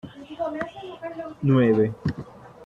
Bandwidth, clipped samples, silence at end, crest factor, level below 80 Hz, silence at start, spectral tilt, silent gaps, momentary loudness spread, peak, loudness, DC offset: 7.2 kHz; under 0.1%; 0 s; 16 dB; -54 dBFS; 0.05 s; -9.5 dB/octave; none; 19 LU; -8 dBFS; -24 LUFS; under 0.1%